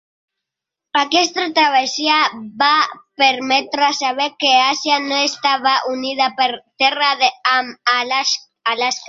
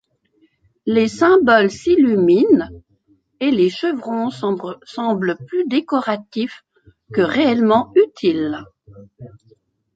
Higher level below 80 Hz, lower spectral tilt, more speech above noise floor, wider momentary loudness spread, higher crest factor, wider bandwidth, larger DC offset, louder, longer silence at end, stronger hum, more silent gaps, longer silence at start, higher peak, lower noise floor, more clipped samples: second, -70 dBFS vs -54 dBFS; second, -0.5 dB/octave vs -6 dB/octave; first, 67 dB vs 43 dB; second, 5 LU vs 12 LU; about the same, 16 dB vs 16 dB; about the same, 7.8 kHz vs 8 kHz; neither; about the same, -16 LUFS vs -17 LUFS; second, 0 s vs 0.7 s; neither; neither; about the same, 0.95 s vs 0.85 s; about the same, -2 dBFS vs -2 dBFS; first, -84 dBFS vs -60 dBFS; neither